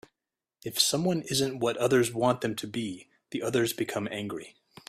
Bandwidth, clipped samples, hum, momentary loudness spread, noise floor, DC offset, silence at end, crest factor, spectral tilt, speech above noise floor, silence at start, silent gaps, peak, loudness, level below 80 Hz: 16 kHz; under 0.1%; none; 14 LU; -89 dBFS; under 0.1%; 0.4 s; 22 dB; -4 dB/octave; 61 dB; 0.65 s; none; -8 dBFS; -28 LUFS; -66 dBFS